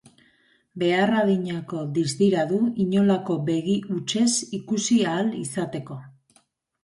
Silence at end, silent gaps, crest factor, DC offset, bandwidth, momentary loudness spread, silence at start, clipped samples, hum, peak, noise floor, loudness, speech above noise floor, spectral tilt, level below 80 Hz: 0.75 s; none; 16 dB; under 0.1%; 11.5 kHz; 9 LU; 0.75 s; under 0.1%; none; -8 dBFS; -64 dBFS; -23 LUFS; 41 dB; -5 dB/octave; -64 dBFS